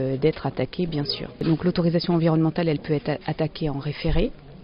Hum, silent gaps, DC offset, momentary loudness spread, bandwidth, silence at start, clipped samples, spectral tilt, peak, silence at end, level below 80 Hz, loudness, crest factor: none; none; under 0.1%; 7 LU; 5.4 kHz; 0 s; under 0.1%; -6.5 dB/octave; -8 dBFS; 0 s; -36 dBFS; -24 LUFS; 16 dB